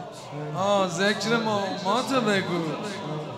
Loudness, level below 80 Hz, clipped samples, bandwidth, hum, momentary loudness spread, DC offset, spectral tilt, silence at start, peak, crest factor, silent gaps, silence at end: -25 LUFS; -68 dBFS; under 0.1%; 15 kHz; none; 10 LU; under 0.1%; -4.5 dB/octave; 0 s; -8 dBFS; 18 dB; none; 0 s